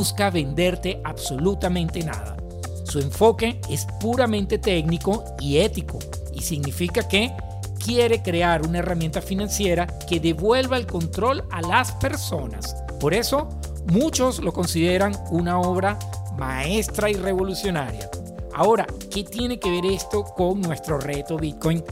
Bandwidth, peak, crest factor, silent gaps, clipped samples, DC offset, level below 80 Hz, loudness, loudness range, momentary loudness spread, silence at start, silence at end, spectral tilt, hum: 16 kHz; -4 dBFS; 20 dB; none; under 0.1%; under 0.1%; -36 dBFS; -23 LUFS; 2 LU; 11 LU; 0 s; 0 s; -5 dB/octave; none